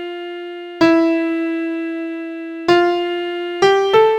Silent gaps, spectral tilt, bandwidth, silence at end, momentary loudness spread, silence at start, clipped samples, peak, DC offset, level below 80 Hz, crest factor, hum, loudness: none; -5 dB/octave; 8.8 kHz; 0 s; 15 LU; 0 s; under 0.1%; 0 dBFS; under 0.1%; -58 dBFS; 16 dB; none; -17 LUFS